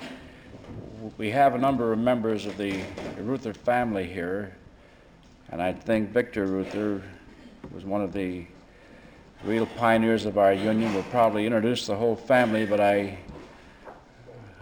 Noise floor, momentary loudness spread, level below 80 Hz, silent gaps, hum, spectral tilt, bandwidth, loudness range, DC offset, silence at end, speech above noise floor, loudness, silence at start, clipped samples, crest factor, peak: -53 dBFS; 20 LU; -56 dBFS; none; none; -6.5 dB/octave; 18.5 kHz; 8 LU; under 0.1%; 0 s; 28 dB; -26 LUFS; 0 s; under 0.1%; 18 dB; -8 dBFS